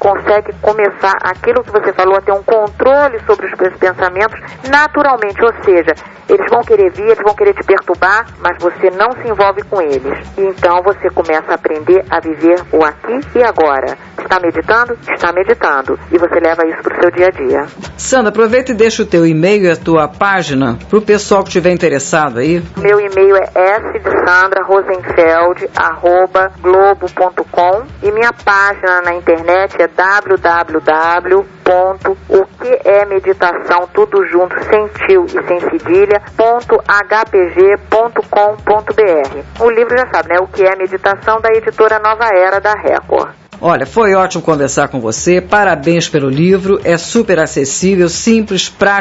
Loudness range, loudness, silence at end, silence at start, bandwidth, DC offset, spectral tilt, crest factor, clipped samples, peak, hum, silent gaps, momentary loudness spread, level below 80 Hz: 2 LU; -11 LUFS; 0 s; 0 s; 8 kHz; under 0.1%; -5 dB/octave; 10 dB; under 0.1%; 0 dBFS; none; none; 5 LU; -40 dBFS